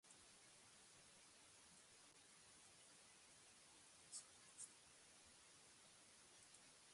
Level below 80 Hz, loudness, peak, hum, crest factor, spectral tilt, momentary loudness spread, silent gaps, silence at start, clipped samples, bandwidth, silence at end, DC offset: under -90 dBFS; -64 LUFS; -42 dBFS; none; 26 dB; -0.5 dB/octave; 8 LU; none; 0.05 s; under 0.1%; 11.5 kHz; 0 s; under 0.1%